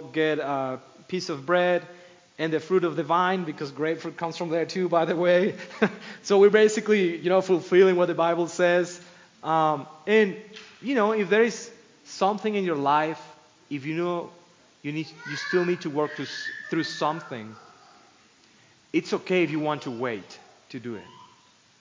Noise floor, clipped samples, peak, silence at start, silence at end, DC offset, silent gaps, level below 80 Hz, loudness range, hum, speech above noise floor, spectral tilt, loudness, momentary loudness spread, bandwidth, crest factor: -58 dBFS; under 0.1%; -4 dBFS; 0 s; 0.75 s; under 0.1%; none; -78 dBFS; 9 LU; none; 34 dB; -5.5 dB/octave; -25 LUFS; 16 LU; 7.6 kHz; 22 dB